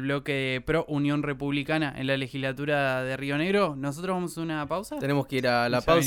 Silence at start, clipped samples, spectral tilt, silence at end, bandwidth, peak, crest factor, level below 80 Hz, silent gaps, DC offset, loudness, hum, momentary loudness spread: 0 s; under 0.1%; -5.5 dB/octave; 0 s; 16.5 kHz; -8 dBFS; 18 dB; -50 dBFS; none; under 0.1%; -27 LUFS; none; 6 LU